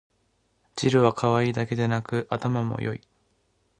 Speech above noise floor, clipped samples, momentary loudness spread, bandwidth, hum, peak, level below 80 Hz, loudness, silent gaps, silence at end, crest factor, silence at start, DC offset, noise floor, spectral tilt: 45 dB; under 0.1%; 11 LU; 10.5 kHz; none; -6 dBFS; -58 dBFS; -25 LUFS; none; 0.8 s; 20 dB; 0.75 s; under 0.1%; -69 dBFS; -6.5 dB/octave